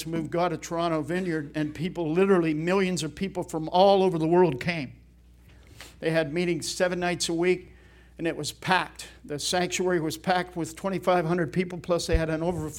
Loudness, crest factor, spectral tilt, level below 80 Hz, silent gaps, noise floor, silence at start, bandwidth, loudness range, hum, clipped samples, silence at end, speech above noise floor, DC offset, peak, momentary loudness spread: -26 LUFS; 20 dB; -5 dB/octave; -46 dBFS; none; -53 dBFS; 0 s; 17 kHz; 4 LU; none; under 0.1%; 0 s; 28 dB; under 0.1%; -6 dBFS; 10 LU